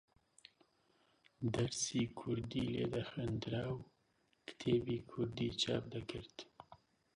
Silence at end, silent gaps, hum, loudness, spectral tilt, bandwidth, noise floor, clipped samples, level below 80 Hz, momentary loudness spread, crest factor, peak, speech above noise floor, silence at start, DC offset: 0.4 s; none; none; -40 LUFS; -5 dB/octave; 11.5 kHz; -78 dBFS; under 0.1%; -64 dBFS; 16 LU; 20 dB; -22 dBFS; 38 dB; 1.4 s; under 0.1%